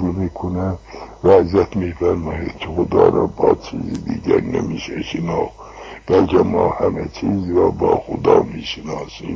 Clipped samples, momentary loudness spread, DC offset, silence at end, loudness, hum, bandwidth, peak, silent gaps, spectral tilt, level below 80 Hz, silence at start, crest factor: under 0.1%; 13 LU; under 0.1%; 0 s; -18 LUFS; none; 7.4 kHz; 0 dBFS; none; -7.5 dB/octave; -36 dBFS; 0 s; 18 dB